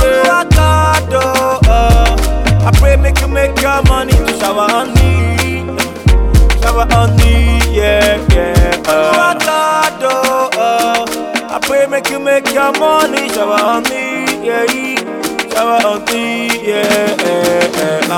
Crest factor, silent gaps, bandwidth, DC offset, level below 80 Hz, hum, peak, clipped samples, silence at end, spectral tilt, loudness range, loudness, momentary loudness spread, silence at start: 10 dB; none; 17.5 kHz; under 0.1%; -16 dBFS; none; 0 dBFS; under 0.1%; 0 s; -5 dB/octave; 3 LU; -11 LUFS; 6 LU; 0 s